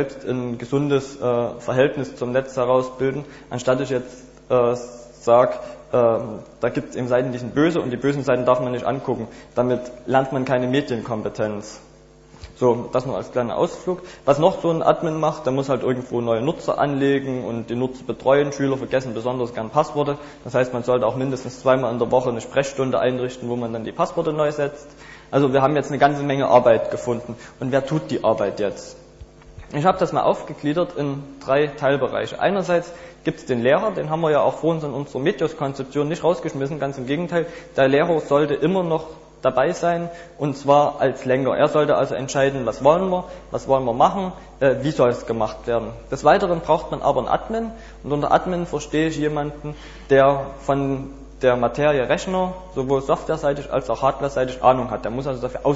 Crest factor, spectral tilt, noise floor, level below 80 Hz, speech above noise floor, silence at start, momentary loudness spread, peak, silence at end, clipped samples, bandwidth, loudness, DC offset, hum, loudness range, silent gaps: 18 dB; -6.5 dB/octave; -47 dBFS; -48 dBFS; 27 dB; 0 s; 9 LU; -2 dBFS; 0 s; under 0.1%; 8 kHz; -21 LUFS; under 0.1%; none; 3 LU; none